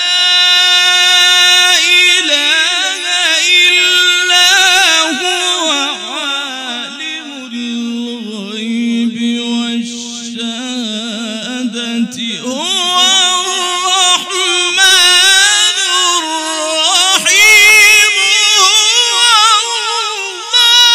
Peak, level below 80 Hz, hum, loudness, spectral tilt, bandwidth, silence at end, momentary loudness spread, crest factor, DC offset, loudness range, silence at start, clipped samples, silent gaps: 0 dBFS; -60 dBFS; none; -8 LUFS; 1 dB/octave; over 20 kHz; 0 s; 15 LU; 10 dB; under 0.1%; 12 LU; 0 s; 0.5%; none